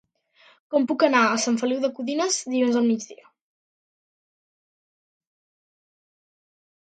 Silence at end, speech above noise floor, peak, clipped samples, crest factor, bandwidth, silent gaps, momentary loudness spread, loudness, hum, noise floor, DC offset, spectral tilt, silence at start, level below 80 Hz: 3.7 s; 36 dB; -4 dBFS; under 0.1%; 22 dB; 9.4 kHz; none; 7 LU; -22 LUFS; none; -58 dBFS; under 0.1%; -3 dB/octave; 0.7 s; -80 dBFS